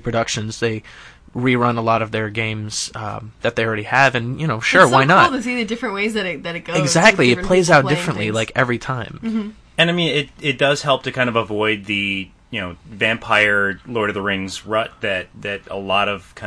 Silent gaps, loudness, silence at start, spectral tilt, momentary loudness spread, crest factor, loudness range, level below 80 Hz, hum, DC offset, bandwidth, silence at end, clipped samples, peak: none; -18 LUFS; 0.05 s; -4.5 dB/octave; 13 LU; 18 dB; 5 LU; -46 dBFS; none; under 0.1%; 11 kHz; 0 s; under 0.1%; 0 dBFS